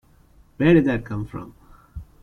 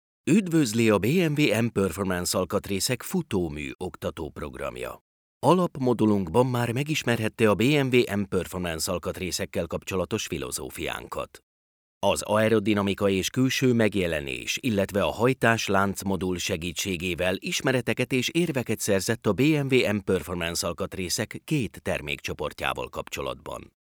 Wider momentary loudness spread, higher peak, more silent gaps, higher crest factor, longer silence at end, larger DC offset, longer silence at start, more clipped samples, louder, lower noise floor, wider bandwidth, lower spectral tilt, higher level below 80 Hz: first, 25 LU vs 11 LU; about the same, -4 dBFS vs -4 dBFS; second, none vs 3.75-3.79 s, 5.01-5.41 s, 11.43-12.01 s; about the same, 20 dB vs 20 dB; about the same, 0.2 s vs 0.3 s; neither; first, 0.6 s vs 0.25 s; neither; first, -20 LUFS vs -26 LUFS; second, -54 dBFS vs under -90 dBFS; second, 6.4 kHz vs over 20 kHz; first, -9 dB/octave vs -5 dB/octave; first, -44 dBFS vs -54 dBFS